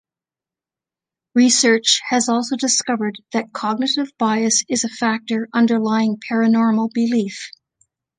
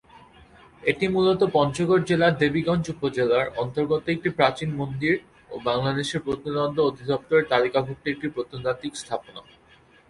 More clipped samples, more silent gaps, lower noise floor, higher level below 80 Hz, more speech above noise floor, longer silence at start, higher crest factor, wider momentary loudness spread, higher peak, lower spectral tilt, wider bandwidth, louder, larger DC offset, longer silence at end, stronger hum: neither; neither; first, -90 dBFS vs -55 dBFS; second, -70 dBFS vs -54 dBFS; first, 72 dB vs 32 dB; first, 1.35 s vs 0.15 s; about the same, 18 dB vs 18 dB; about the same, 9 LU vs 10 LU; first, -2 dBFS vs -6 dBFS; second, -2.5 dB/octave vs -6 dB/octave; second, 10 kHz vs 11.5 kHz; first, -18 LUFS vs -24 LUFS; neither; about the same, 0.7 s vs 0.7 s; neither